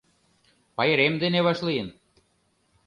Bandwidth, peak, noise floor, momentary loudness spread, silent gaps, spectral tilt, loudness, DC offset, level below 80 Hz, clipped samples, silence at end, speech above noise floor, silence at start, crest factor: 10.5 kHz; -8 dBFS; -69 dBFS; 14 LU; none; -6.5 dB/octave; -23 LUFS; under 0.1%; -64 dBFS; under 0.1%; 0.95 s; 45 dB; 0.8 s; 20 dB